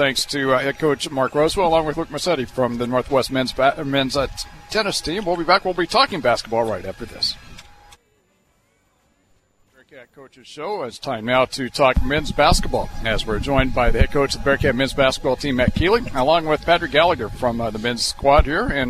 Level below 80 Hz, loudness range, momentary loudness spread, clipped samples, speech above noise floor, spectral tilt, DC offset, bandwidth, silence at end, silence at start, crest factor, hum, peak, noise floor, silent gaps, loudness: -30 dBFS; 10 LU; 8 LU; under 0.1%; 43 dB; -4.5 dB/octave; under 0.1%; 14.5 kHz; 0 s; 0 s; 18 dB; none; -2 dBFS; -62 dBFS; none; -19 LUFS